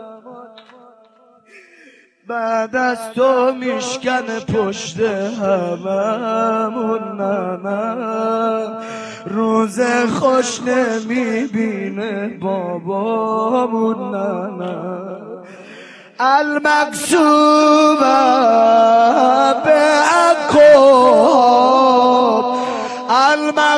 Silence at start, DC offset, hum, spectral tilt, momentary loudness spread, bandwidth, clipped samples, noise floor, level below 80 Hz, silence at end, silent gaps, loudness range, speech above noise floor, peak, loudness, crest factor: 0 s; under 0.1%; none; -4.5 dB/octave; 12 LU; 11 kHz; under 0.1%; -50 dBFS; -60 dBFS; 0 s; none; 10 LU; 35 dB; 0 dBFS; -15 LUFS; 14 dB